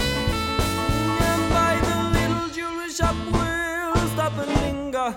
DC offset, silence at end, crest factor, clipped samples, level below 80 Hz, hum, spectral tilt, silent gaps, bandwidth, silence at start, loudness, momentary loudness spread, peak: under 0.1%; 0 s; 18 dB; under 0.1%; -32 dBFS; none; -5 dB/octave; none; 19.5 kHz; 0 s; -23 LUFS; 6 LU; -6 dBFS